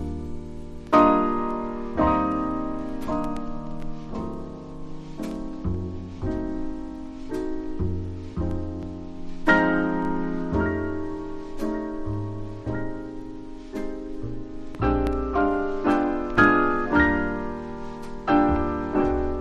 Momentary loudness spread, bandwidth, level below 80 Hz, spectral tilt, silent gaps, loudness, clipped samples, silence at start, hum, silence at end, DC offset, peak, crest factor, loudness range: 17 LU; 9 kHz; -36 dBFS; -8 dB/octave; none; -26 LUFS; under 0.1%; 0 s; none; 0 s; under 0.1%; -4 dBFS; 22 dB; 10 LU